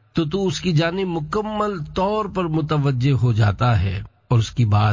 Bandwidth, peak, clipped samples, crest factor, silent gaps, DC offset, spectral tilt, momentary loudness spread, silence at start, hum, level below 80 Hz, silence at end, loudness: 7.6 kHz; -6 dBFS; under 0.1%; 14 dB; none; under 0.1%; -7 dB/octave; 6 LU; 0.15 s; none; -38 dBFS; 0 s; -21 LUFS